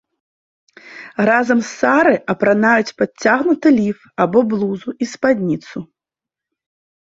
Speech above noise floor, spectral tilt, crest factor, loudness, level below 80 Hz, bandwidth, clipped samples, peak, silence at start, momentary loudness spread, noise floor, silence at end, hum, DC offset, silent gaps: 71 dB; -6 dB/octave; 16 dB; -16 LUFS; -60 dBFS; 7.8 kHz; under 0.1%; -2 dBFS; 0.85 s; 11 LU; -87 dBFS; 1.3 s; none; under 0.1%; none